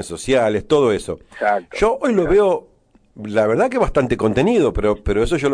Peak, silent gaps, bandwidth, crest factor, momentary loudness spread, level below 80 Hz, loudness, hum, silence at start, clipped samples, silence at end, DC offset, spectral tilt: -6 dBFS; none; 10.5 kHz; 12 dB; 7 LU; -34 dBFS; -18 LUFS; none; 0 s; under 0.1%; 0 s; under 0.1%; -6 dB/octave